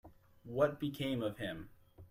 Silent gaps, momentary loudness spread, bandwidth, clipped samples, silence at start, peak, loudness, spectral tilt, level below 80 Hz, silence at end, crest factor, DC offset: none; 13 LU; 16 kHz; under 0.1%; 0.05 s; -18 dBFS; -38 LUFS; -6.5 dB/octave; -66 dBFS; 0.05 s; 20 dB; under 0.1%